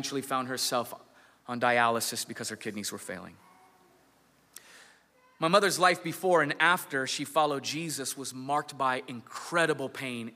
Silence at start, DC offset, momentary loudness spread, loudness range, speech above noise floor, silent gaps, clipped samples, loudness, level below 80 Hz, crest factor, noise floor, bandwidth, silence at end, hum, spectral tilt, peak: 0 s; under 0.1%; 15 LU; 7 LU; 35 dB; none; under 0.1%; -29 LUFS; -80 dBFS; 22 dB; -65 dBFS; 16 kHz; 0 s; none; -3 dB/octave; -8 dBFS